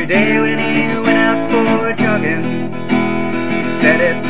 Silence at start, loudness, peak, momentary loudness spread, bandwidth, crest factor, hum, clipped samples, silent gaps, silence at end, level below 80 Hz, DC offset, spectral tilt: 0 s; -14 LUFS; 0 dBFS; 6 LU; 4 kHz; 14 dB; none; under 0.1%; none; 0 s; -52 dBFS; 6%; -10 dB/octave